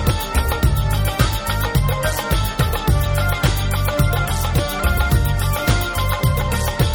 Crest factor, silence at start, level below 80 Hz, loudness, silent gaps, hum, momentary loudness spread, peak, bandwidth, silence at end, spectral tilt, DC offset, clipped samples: 16 dB; 0 s; -22 dBFS; -19 LUFS; none; none; 2 LU; -2 dBFS; 18.5 kHz; 0 s; -5 dB/octave; under 0.1%; under 0.1%